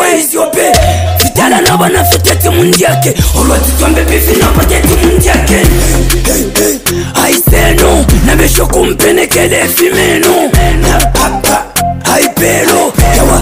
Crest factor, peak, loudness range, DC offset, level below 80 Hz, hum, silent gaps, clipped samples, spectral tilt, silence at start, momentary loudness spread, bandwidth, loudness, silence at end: 8 dB; 0 dBFS; 1 LU; under 0.1%; -14 dBFS; none; none; 0.6%; -4 dB/octave; 0 s; 3 LU; 16.5 kHz; -7 LUFS; 0 s